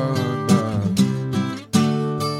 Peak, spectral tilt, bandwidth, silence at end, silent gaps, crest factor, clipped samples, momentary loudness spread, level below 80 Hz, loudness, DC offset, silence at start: -2 dBFS; -6 dB/octave; 16 kHz; 0 s; none; 18 dB; under 0.1%; 4 LU; -54 dBFS; -21 LUFS; under 0.1%; 0 s